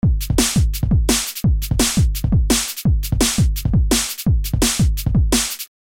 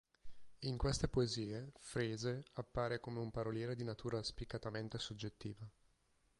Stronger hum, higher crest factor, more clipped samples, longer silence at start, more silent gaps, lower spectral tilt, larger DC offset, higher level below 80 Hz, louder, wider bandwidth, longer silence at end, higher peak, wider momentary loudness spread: neither; second, 12 dB vs 20 dB; neither; second, 0.05 s vs 0.25 s; neither; second, -4 dB/octave vs -5.5 dB/octave; neither; first, -22 dBFS vs -56 dBFS; first, -18 LUFS vs -43 LUFS; first, 17 kHz vs 11.5 kHz; second, 0.2 s vs 0.7 s; first, -4 dBFS vs -24 dBFS; second, 3 LU vs 10 LU